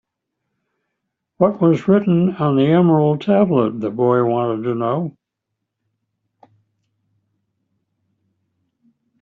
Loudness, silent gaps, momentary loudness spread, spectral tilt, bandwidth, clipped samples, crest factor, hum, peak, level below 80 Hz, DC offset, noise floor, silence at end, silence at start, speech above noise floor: -17 LUFS; none; 7 LU; -8 dB/octave; 6.8 kHz; under 0.1%; 16 dB; none; -2 dBFS; -60 dBFS; under 0.1%; -79 dBFS; 4.1 s; 1.4 s; 63 dB